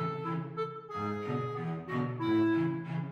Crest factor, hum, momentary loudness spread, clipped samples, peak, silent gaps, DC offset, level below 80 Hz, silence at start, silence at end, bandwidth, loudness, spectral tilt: 14 dB; none; 9 LU; under 0.1%; -20 dBFS; none; under 0.1%; -72 dBFS; 0 s; 0 s; 6.6 kHz; -34 LUFS; -9 dB/octave